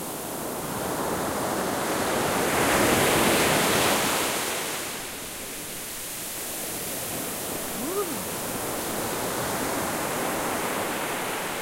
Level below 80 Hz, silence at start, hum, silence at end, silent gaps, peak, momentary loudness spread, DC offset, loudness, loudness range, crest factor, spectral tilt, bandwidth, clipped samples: -52 dBFS; 0 s; none; 0 s; none; -10 dBFS; 11 LU; under 0.1%; -26 LUFS; 8 LU; 18 dB; -2.5 dB/octave; 16 kHz; under 0.1%